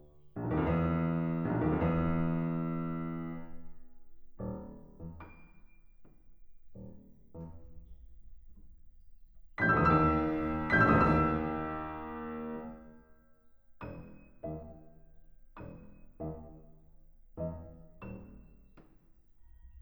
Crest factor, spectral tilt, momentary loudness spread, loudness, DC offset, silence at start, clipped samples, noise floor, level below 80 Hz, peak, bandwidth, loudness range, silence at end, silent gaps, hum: 22 dB; -9.5 dB/octave; 26 LU; -32 LUFS; under 0.1%; 0 s; under 0.1%; -61 dBFS; -50 dBFS; -12 dBFS; over 20 kHz; 24 LU; 0 s; none; none